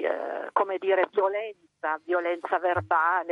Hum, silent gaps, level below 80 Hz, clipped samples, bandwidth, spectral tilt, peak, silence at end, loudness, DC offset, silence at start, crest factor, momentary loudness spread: none; none; -70 dBFS; under 0.1%; 5.4 kHz; -7 dB/octave; -10 dBFS; 0 s; -27 LUFS; under 0.1%; 0 s; 18 dB; 8 LU